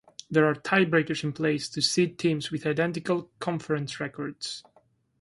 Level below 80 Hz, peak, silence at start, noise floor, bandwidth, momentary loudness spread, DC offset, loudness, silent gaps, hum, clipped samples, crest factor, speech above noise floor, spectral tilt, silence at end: -66 dBFS; -8 dBFS; 0.3 s; -65 dBFS; 11.5 kHz; 11 LU; under 0.1%; -27 LUFS; none; none; under 0.1%; 20 dB; 38 dB; -5 dB/octave; 0.6 s